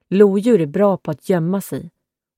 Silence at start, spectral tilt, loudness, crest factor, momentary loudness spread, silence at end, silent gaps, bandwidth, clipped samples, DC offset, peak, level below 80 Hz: 0.1 s; -8 dB/octave; -17 LUFS; 16 dB; 12 LU; 0.5 s; none; 16.5 kHz; under 0.1%; under 0.1%; 0 dBFS; -62 dBFS